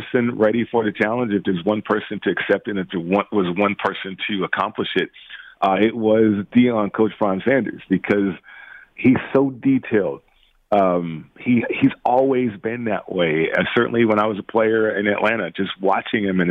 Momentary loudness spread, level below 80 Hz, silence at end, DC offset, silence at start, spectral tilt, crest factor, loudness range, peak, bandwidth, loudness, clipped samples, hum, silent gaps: 8 LU; -58 dBFS; 0 s; under 0.1%; 0 s; -8.5 dB/octave; 16 dB; 2 LU; -4 dBFS; 5.2 kHz; -20 LUFS; under 0.1%; none; none